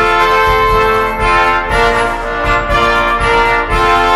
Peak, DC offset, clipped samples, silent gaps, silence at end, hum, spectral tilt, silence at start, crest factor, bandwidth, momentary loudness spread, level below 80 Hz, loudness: 0 dBFS; under 0.1%; under 0.1%; none; 0 s; none; -4.5 dB/octave; 0 s; 12 dB; 15.5 kHz; 4 LU; -22 dBFS; -11 LUFS